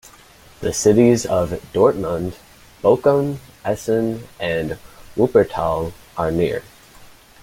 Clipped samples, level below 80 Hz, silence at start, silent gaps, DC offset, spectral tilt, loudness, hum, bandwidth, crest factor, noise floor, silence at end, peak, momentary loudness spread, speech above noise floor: under 0.1%; -46 dBFS; 0.6 s; none; under 0.1%; -6 dB/octave; -19 LUFS; none; 16.5 kHz; 18 dB; -47 dBFS; 0.4 s; -2 dBFS; 13 LU; 28 dB